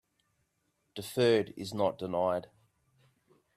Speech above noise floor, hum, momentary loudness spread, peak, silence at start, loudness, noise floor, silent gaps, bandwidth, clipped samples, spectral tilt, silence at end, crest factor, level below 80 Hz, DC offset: 47 dB; none; 13 LU; -16 dBFS; 0.95 s; -31 LUFS; -78 dBFS; none; 15 kHz; under 0.1%; -5.5 dB/octave; 1.15 s; 18 dB; -74 dBFS; under 0.1%